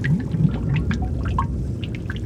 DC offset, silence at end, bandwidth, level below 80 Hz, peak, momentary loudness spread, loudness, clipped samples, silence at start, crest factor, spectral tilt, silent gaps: under 0.1%; 0 s; 9 kHz; -30 dBFS; -6 dBFS; 7 LU; -23 LUFS; under 0.1%; 0 s; 16 dB; -8 dB/octave; none